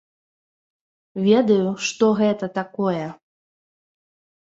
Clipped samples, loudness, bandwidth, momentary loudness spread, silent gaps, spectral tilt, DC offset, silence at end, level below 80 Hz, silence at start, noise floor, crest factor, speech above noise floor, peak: under 0.1%; -20 LUFS; 7.8 kHz; 11 LU; none; -5.5 dB/octave; under 0.1%; 1.25 s; -68 dBFS; 1.15 s; under -90 dBFS; 18 dB; over 70 dB; -4 dBFS